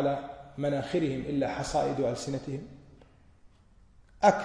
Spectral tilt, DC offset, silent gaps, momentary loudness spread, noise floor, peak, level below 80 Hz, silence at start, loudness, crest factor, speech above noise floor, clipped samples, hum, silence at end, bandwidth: -6 dB/octave; under 0.1%; none; 13 LU; -59 dBFS; -10 dBFS; -54 dBFS; 0 s; -31 LUFS; 22 dB; 29 dB; under 0.1%; none; 0 s; 10.5 kHz